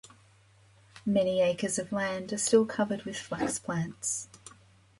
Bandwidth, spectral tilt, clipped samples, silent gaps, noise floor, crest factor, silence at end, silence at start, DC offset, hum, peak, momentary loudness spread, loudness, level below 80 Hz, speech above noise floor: 11.5 kHz; -4 dB/octave; under 0.1%; none; -61 dBFS; 20 dB; 0.5 s; 0.95 s; under 0.1%; none; -12 dBFS; 11 LU; -30 LUFS; -66 dBFS; 31 dB